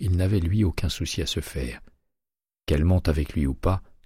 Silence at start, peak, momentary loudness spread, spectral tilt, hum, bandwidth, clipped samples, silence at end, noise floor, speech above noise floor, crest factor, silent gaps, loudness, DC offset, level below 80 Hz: 0 s; -10 dBFS; 11 LU; -6 dB/octave; none; 15.5 kHz; under 0.1%; 0.25 s; under -90 dBFS; over 66 dB; 16 dB; none; -25 LUFS; under 0.1%; -32 dBFS